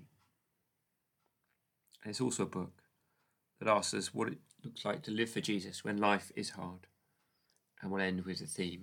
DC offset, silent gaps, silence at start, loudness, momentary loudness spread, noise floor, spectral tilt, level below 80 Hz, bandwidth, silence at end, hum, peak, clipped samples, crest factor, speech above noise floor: under 0.1%; none; 0 s; -37 LUFS; 16 LU; -84 dBFS; -4 dB/octave; -86 dBFS; 19 kHz; 0 s; none; -16 dBFS; under 0.1%; 24 dB; 47 dB